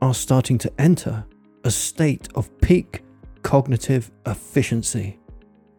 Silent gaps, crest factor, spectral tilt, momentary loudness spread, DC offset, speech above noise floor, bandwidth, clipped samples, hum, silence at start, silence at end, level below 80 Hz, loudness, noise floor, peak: none; 18 dB; -6 dB/octave; 12 LU; under 0.1%; 26 dB; 18 kHz; under 0.1%; none; 0 s; 0.4 s; -36 dBFS; -21 LUFS; -46 dBFS; -4 dBFS